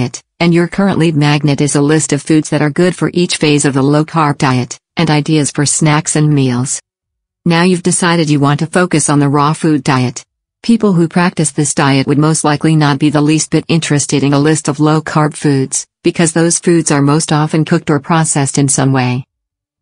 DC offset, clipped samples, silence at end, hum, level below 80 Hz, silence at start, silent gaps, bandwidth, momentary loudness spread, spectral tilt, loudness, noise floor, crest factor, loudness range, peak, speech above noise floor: under 0.1%; under 0.1%; 0.6 s; none; -48 dBFS; 0 s; none; 10.5 kHz; 4 LU; -5 dB/octave; -12 LUFS; -77 dBFS; 12 dB; 1 LU; 0 dBFS; 66 dB